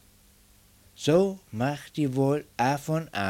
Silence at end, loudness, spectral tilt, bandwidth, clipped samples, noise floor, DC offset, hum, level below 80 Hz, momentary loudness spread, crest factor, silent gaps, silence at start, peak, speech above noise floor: 0 s; -27 LUFS; -6 dB/octave; 17 kHz; under 0.1%; -58 dBFS; under 0.1%; none; -60 dBFS; 7 LU; 18 dB; none; 1 s; -10 dBFS; 32 dB